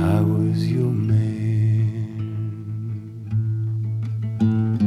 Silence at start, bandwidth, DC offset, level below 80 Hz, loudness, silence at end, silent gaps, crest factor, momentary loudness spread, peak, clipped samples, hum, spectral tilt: 0 s; 5.6 kHz; under 0.1%; -52 dBFS; -23 LUFS; 0 s; none; 12 dB; 10 LU; -10 dBFS; under 0.1%; none; -9.5 dB/octave